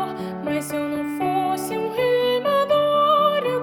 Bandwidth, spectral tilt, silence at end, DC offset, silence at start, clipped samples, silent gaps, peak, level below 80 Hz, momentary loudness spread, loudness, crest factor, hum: over 20 kHz; -4.5 dB/octave; 0 s; under 0.1%; 0 s; under 0.1%; none; -8 dBFS; -60 dBFS; 9 LU; -21 LUFS; 14 dB; none